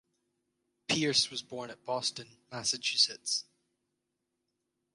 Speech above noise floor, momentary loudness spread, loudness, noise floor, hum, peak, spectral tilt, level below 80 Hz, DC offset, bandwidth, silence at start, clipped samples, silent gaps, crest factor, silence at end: 51 dB; 16 LU; -30 LUFS; -84 dBFS; none; -12 dBFS; -1.5 dB/octave; -76 dBFS; under 0.1%; 11.5 kHz; 0.9 s; under 0.1%; none; 22 dB; 1.55 s